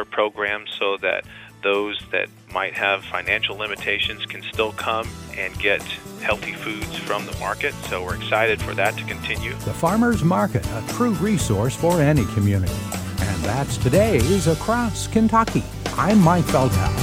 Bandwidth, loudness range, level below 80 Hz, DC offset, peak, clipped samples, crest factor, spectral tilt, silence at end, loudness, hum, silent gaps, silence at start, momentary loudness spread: 16.5 kHz; 5 LU; -38 dBFS; under 0.1%; -4 dBFS; under 0.1%; 18 dB; -5 dB/octave; 0 s; -21 LUFS; none; none; 0 s; 10 LU